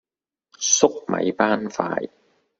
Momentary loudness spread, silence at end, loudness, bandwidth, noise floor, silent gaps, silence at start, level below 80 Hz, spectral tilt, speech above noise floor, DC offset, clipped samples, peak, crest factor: 10 LU; 0.5 s; -21 LUFS; 8 kHz; -78 dBFS; none; 0.6 s; -64 dBFS; -2.5 dB/octave; 57 dB; under 0.1%; under 0.1%; -2 dBFS; 22 dB